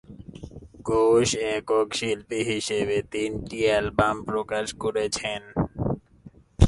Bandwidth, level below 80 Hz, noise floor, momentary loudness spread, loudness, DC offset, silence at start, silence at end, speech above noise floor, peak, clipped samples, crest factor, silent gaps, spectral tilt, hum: 11.5 kHz; -36 dBFS; -51 dBFS; 14 LU; -25 LUFS; under 0.1%; 0.1 s; 0 s; 26 dB; 0 dBFS; under 0.1%; 24 dB; none; -5 dB/octave; none